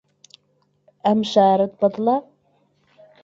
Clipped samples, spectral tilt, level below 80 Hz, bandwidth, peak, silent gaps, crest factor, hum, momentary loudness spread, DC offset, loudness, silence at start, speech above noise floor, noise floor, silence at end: under 0.1%; -6.5 dB/octave; -66 dBFS; 7.8 kHz; -4 dBFS; none; 18 dB; none; 7 LU; under 0.1%; -19 LUFS; 1.05 s; 48 dB; -65 dBFS; 1.05 s